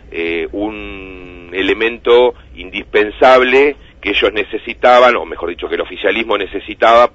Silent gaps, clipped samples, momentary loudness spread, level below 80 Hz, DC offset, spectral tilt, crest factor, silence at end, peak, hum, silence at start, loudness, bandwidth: none; 0.2%; 16 LU; -40 dBFS; under 0.1%; -4.5 dB/octave; 14 dB; 0.05 s; 0 dBFS; none; 0.1 s; -13 LUFS; 8 kHz